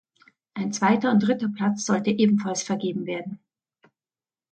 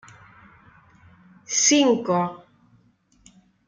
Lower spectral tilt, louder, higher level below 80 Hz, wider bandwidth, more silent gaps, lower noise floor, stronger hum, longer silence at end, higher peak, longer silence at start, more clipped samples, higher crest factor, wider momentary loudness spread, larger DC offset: first, -5 dB/octave vs -2.5 dB/octave; second, -24 LUFS vs -20 LUFS; about the same, -70 dBFS vs -68 dBFS; second, 8.8 kHz vs 10.5 kHz; neither; first, under -90 dBFS vs -61 dBFS; neither; second, 1.15 s vs 1.3 s; second, -8 dBFS vs -4 dBFS; second, 0.55 s vs 1.5 s; neither; second, 16 dB vs 22 dB; first, 12 LU vs 9 LU; neither